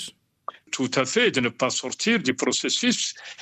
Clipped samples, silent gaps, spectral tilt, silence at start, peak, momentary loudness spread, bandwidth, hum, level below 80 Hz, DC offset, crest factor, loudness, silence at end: under 0.1%; none; -2.5 dB/octave; 0 s; -8 dBFS; 17 LU; 13.5 kHz; none; -68 dBFS; under 0.1%; 18 dB; -23 LUFS; 0 s